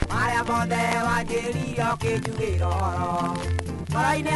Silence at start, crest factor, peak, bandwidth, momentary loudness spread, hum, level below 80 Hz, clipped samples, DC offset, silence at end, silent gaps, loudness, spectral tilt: 0 s; 20 dB; -6 dBFS; 11.5 kHz; 5 LU; none; -38 dBFS; under 0.1%; under 0.1%; 0 s; none; -25 LUFS; -5.5 dB/octave